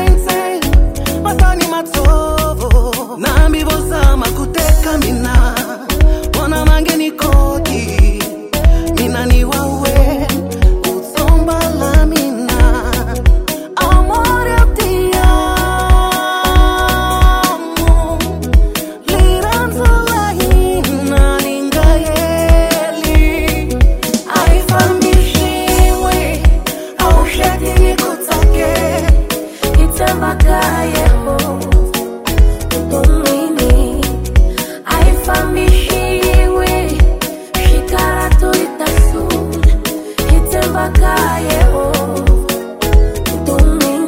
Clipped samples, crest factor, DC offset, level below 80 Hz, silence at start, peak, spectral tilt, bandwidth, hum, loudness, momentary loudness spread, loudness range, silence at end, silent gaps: 0.3%; 10 dB; 0.1%; -12 dBFS; 0 s; 0 dBFS; -5 dB/octave; 16.5 kHz; none; -13 LUFS; 5 LU; 1 LU; 0 s; none